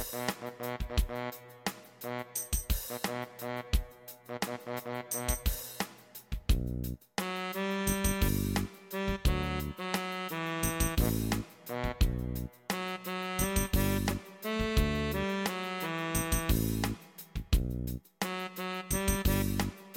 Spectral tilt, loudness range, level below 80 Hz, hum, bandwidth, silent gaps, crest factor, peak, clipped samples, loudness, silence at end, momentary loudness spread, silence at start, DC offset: -4.5 dB/octave; 4 LU; -38 dBFS; none; 17 kHz; none; 18 dB; -14 dBFS; under 0.1%; -34 LUFS; 0 s; 9 LU; 0 s; under 0.1%